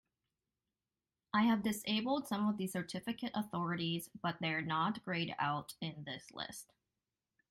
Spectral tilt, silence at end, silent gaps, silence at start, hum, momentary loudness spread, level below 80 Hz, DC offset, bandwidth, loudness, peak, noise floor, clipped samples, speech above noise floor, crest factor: -5 dB/octave; 0.9 s; none; 1.35 s; none; 12 LU; -76 dBFS; under 0.1%; 16 kHz; -38 LUFS; -20 dBFS; under -90 dBFS; under 0.1%; over 52 dB; 18 dB